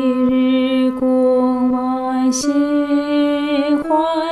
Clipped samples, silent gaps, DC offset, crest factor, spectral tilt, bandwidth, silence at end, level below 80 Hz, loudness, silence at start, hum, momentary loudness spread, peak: under 0.1%; none; 0.2%; 10 dB; -4 dB/octave; 12 kHz; 0 s; -52 dBFS; -16 LUFS; 0 s; none; 3 LU; -6 dBFS